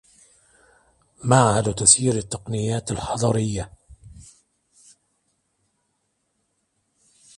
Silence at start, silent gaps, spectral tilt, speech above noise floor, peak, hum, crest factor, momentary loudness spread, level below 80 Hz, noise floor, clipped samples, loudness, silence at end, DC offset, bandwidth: 1.2 s; none; -4 dB/octave; 52 dB; 0 dBFS; none; 24 dB; 15 LU; -48 dBFS; -73 dBFS; under 0.1%; -20 LUFS; 3.15 s; under 0.1%; 11.5 kHz